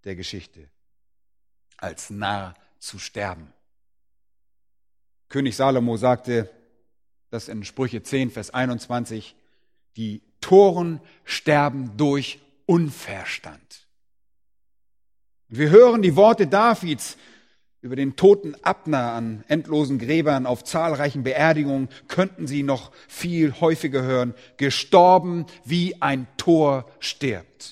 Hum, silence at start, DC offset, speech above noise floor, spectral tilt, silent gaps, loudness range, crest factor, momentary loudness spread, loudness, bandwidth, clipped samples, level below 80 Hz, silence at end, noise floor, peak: none; 0.05 s; under 0.1%; 62 dB; -6 dB/octave; none; 15 LU; 22 dB; 18 LU; -21 LUFS; 15 kHz; under 0.1%; -60 dBFS; 0 s; -83 dBFS; 0 dBFS